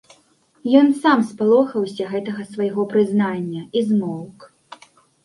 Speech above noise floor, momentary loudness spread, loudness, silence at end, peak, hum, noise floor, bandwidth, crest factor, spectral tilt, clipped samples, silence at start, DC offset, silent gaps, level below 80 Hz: 40 dB; 14 LU; -19 LUFS; 0.5 s; -2 dBFS; none; -58 dBFS; 11.5 kHz; 18 dB; -7 dB/octave; under 0.1%; 0.65 s; under 0.1%; none; -66 dBFS